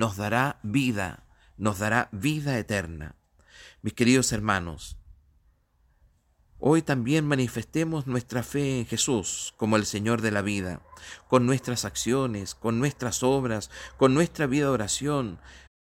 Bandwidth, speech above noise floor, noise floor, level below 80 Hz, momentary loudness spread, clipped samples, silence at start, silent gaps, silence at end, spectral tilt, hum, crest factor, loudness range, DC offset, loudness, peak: 16.5 kHz; 39 dB; -65 dBFS; -52 dBFS; 13 LU; under 0.1%; 0 s; none; 0.25 s; -5 dB/octave; none; 20 dB; 3 LU; under 0.1%; -26 LUFS; -6 dBFS